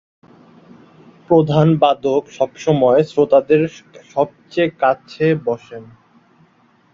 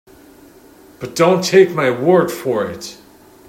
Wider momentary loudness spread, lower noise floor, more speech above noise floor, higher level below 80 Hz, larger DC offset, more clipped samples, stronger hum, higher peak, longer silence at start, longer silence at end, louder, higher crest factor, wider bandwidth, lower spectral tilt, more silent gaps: second, 11 LU vs 19 LU; first, -54 dBFS vs -44 dBFS; first, 39 dB vs 30 dB; about the same, -56 dBFS vs -58 dBFS; neither; neither; neither; about the same, -2 dBFS vs 0 dBFS; first, 1.3 s vs 1 s; first, 1.1 s vs 0.55 s; about the same, -16 LUFS vs -15 LUFS; about the same, 16 dB vs 16 dB; second, 7.4 kHz vs 16 kHz; first, -7.5 dB/octave vs -5 dB/octave; neither